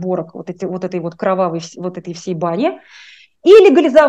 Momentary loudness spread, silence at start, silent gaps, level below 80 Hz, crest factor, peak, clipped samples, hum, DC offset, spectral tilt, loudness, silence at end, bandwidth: 19 LU; 0 s; none; -58 dBFS; 14 dB; 0 dBFS; 0.4%; none; under 0.1%; -6 dB/octave; -14 LUFS; 0 s; 8.6 kHz